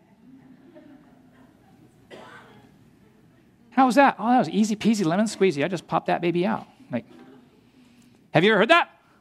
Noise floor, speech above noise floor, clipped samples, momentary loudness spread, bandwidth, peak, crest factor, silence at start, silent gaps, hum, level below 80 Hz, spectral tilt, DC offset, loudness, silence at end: -56 dBFS; 35 dB; under 0.1%; 16 LU; 13.5 kHz; -2 dBFS; 22 dB; 2.1 s; none; none; -70 dBFS; -5.5 dB/octave; under 0.1%; -22 LUFS; 0.35 s